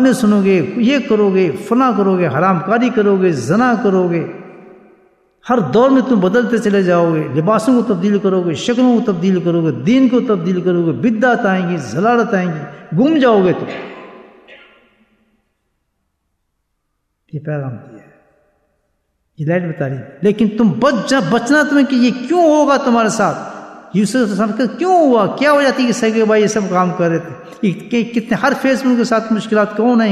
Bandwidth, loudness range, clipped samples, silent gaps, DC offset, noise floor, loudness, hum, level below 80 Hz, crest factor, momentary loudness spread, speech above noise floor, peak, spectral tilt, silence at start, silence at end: 13 kHz; 11 LU; under 0.1%; none; under 0.1%; -69 dBFS; -14 LUFS; none; -58 dBFS; 14 dB; 10 LU; 56 dB; -2 dBFS; -6.5 dB/octave; 0 s; 0 s